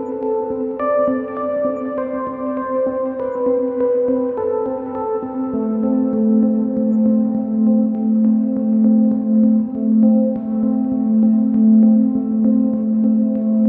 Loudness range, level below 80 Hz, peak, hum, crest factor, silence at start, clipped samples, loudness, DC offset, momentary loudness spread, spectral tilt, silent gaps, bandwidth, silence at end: 5 LU; -56 dBFS; -4 dBFS; none; 12 dB; 0 s; under 0.1%; -17 LUFS; under 0.1%; 9 LU; -13 dB/octave; none; 2.5 kHz; 0 s